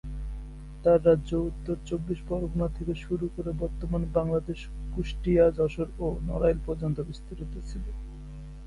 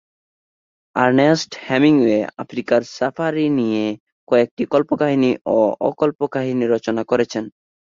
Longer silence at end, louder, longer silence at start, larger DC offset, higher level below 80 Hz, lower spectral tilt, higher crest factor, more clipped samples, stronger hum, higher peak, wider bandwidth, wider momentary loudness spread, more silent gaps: second, 0 s vs 0.45 s; second, -29 LUFS vs -18 LUFS; second, 0.05 s vs 0.95 s; neither; first, -38 dBFS vs -60 dBFS; first, -8.5 dB/octave vs -6 dB/octave; about the same, 18 dB vs 16 dB; neither; neither; second, -10 dBFS vs -2 dBFS; first, 11 kHz vs 7.6 kHz; first, 17 LU vs 10 LU; second, none vs 4.00-4.06 s, 4.12-4.27 s, 4.51-4.57 s, 5.41-5.45 s